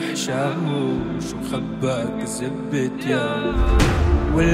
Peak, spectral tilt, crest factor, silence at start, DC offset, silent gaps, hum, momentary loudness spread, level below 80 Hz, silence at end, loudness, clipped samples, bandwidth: -2 dBFS; -6 dB/octave; 18 dB; 0 s; under 0.1%; none; none; 8 LU; -26 dBFS; 0 s; -22 LUFS; under 0.1%; 15.5 kHz